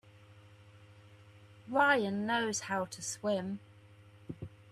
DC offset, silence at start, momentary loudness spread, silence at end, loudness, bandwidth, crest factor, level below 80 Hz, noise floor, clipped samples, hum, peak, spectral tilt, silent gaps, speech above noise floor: under 0.1%; 0.3 s; 20 LU; 0 s; -33 LUFS; 13.5 kHz; 20 dB; -74 dBFS; -58 dBFS; under 0.1%; none; -16 dBFS; -3.5 dB/octave; none; 25 dB